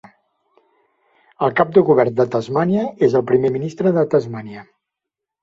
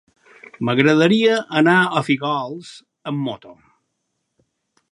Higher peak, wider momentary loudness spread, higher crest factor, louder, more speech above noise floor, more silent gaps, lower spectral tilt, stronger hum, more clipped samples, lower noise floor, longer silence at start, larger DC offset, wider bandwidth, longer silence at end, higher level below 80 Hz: about the same, -2 dBFS vs 0 dBFS; second, 13 LU vs 20 LU; about the same, 16 dB vs 20 dB; about the same, -17 LUFS vs -18 LUFS; first, 67 dB vs 56 dB; neither; first, -8.5 dB/octave vs -6 dB/octave; neither; neither; first, -83 dBFS vs -74 dBFS; first, 1.4 s vs 0.6 s; neither; second, 7.4 kHz vs 11.5 kHz; second, 0.8 s vs 1.4 s; first, -60 dBFS vs -68 dBFS